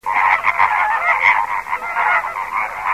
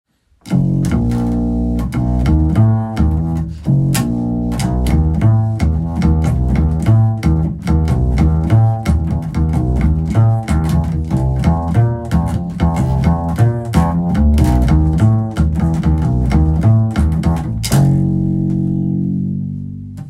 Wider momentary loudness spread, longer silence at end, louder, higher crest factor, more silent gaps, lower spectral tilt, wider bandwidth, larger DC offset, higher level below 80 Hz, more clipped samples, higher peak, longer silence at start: first, 8 LU vs 5 LU; about the same, 0 s vs 0 s; about the same, -16 LUFS vs -15 LUFS; about the same, 16 dB vs 14 dB; neither; second, -2 dB/octave vs -8 dB/octave; first, 16 kHz vs 14.5 kHz; first, 0.2% vs under 0.1%; second, -52 dBFS vs -20 dBFS; neither; about the same, -2 dBFS vs 0 dBFS; second, 0.05 s vs 0.45 s